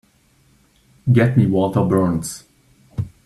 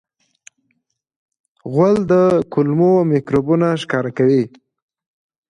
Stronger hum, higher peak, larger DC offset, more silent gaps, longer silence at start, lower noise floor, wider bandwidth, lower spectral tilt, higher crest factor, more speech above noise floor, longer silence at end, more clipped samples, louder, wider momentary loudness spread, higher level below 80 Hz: neither; about the same, -2 dBFS vs -2 dBFS; neither; neither; second, 1.05 s vs 1.65 s; second, -57 dBFS vs -69 dBFS; first, 13 kHz vs 10 kHz; about the same, -7.5 dB/octave vs -8 dB/octave; about the same, 18 dB vs 14 dB; second, 41 dB vs 54 dB; second, 0.2 s vs 1 s; neither; about the same, -18 LUFS vs -16 LUFS; first, 16 LU vs 7 LU; about the same, -48 dBFS vs -52 dBFS